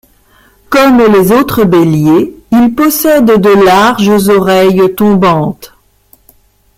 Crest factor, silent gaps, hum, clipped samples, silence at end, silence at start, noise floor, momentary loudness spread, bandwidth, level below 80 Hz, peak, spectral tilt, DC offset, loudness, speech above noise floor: 8 dB; none; none; under 0.1%; 1.1 s; 0.7 s; -46 dBFS; 5 LU; 16.5 kHz; -38 dBFS; 0 dBFS; -6 dB/octave; under 0.1%; -7 LUFS; 40 dB